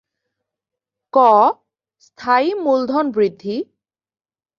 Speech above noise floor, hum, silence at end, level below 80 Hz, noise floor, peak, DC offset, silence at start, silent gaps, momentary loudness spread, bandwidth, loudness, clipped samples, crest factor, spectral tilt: 69 dB; none; 0.95 s; -68 dBFS; -84 dBFS; -2 dBFS; under 0.1%; 1.15 s; none; 16 LU; 7.2 kHz; -16 LUFS; under 0.1%; 18 dB; -6.5 dB/octave